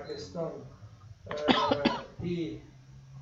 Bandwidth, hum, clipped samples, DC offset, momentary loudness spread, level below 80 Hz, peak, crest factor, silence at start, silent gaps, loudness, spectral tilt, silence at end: 7.8 kHz; none; under 0.1%; under 0.1%; 25 LU; -58 dBFS; -6 dBFS; 28 dB; 0 s; none; -31 LUFS; -5.5 dB/octave; 0 s